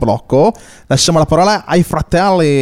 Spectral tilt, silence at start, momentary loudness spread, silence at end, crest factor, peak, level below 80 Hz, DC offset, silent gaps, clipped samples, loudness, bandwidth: -5 dB/octave; 0 s; 4 LU; 0 s; 12 dB; 0 dBFS; -32 dBFS; under 0.1%; none; under 0.1%; -12 LUFS; 15.5 kHz